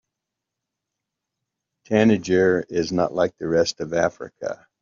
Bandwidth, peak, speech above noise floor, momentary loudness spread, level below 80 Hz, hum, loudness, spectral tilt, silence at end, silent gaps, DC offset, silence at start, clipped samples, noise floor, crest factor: 7.4 kHz; -4 dBFS; 63 dB; 13 LU; -60 dBFS; none; -21 LUFS; -5 dB/octave; 0.25 s; none; under 0.1%; 1.9 s; under 0.1%; -84 dBFS; 18 dB